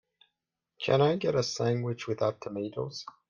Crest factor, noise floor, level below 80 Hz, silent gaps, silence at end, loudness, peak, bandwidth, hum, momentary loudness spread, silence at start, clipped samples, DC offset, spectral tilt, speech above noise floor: 18 dB; -85 dBFS; -68 dBFS; none; 0.2 s; -30 LUFS; -12 dBFS; 10 kHz; none; 11 LU; 0.8 s; under 0.1%; under 0.1%; -5.5 dB/octave; 56 dB